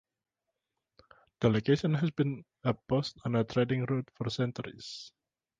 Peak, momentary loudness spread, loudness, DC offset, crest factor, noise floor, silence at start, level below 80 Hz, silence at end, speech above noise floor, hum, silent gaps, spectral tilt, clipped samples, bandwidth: -12 dBFS; 14 LU; -31 LUFS; under 0.1%; 20 dB; -88 dBFS; 1.4 s; -62 dBFS; 0.5 s; 57 dB; none; none; -7 dB/octave; under 0.1%; 7.6 kHz